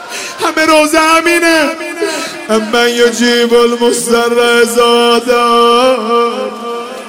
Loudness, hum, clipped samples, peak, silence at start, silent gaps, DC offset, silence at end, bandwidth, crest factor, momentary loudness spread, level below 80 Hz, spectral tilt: -10 LUFS; none; under 0.1%; 0 dBFS; 0 s; none; under 0.1%; 0 s; 16 kHz; 10 dB; 9 LU; -48 dBFS; -2 dB/octave